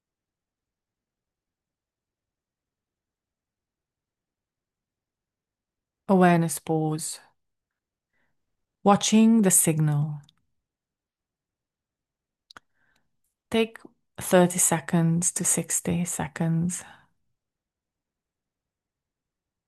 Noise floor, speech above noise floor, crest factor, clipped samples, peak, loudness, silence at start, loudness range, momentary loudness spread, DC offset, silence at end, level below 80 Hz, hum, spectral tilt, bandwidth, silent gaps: -90 dBFS; 67 dB; 22 dB; under 0.1%; -6 dBFS; -23 LUFS; 6.1 s; 11 LU; 12 LU; under 0.1%; 2.85 s; -68 dBFS; none; -4.5 dB/octave; 12.5 kHz; none